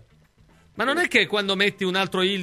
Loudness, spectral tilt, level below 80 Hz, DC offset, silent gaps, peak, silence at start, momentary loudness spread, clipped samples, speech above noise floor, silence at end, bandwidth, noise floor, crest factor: -21 LUFS; -4 dB/octave; -62 dBFS; under 0.1%; none; -4 dBFS; 0.75 s; 5 LU; under 0.1%; 34 dB; 0 s; 16 kHz; -57 dBFS; 20 dB